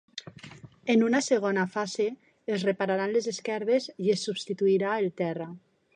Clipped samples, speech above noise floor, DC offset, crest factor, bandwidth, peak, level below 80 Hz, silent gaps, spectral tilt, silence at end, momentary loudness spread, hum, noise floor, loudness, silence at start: under 0.1%; 21 dB; under 0.1%; 16 dB; 10 kHz; -12 dBFS; -76 dBFS; none; -5 dB/octave; 0.4 s; 16 LU; none; -48 dBFS; -28 LUFS; 0.15 s